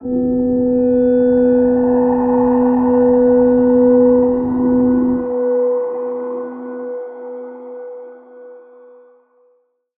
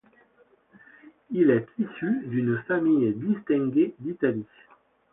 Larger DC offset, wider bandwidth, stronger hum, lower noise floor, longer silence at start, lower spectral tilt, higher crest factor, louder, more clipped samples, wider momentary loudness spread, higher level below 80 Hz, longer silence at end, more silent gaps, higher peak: neither; second, 2.6 kHz vs 3.8 kHz; neither; about the same, -59 dBFS vs -62 dBFS; second, 0 s vs 1.05 s; about the same, -13 dB/octave vs -12 dB/octave; about the same, 12 dB vs 16 dB; first, -14 LUFS vs -25 LUFS; neither; first, 18 LU vs 9 LU; first, -44 dBFS vs -68 dBFS; first, 1.4 s vs 0.7 s; neither; first, -2 dBFS vs -10 dBFS